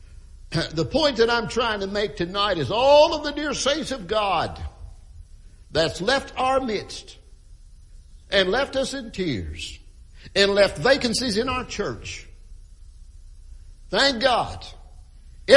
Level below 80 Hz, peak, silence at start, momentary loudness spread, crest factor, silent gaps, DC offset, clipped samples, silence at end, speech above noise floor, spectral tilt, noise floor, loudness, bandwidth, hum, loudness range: -42 dBFS; 0 dBFS; 0 s; 16 LU; 24 dB; none; under 0.1%; under 0.1%; 0 s; 24 dB; -4 dB/octave; -46 dBFS; -22 LUFS; 11.5 kHz; none; 6 LU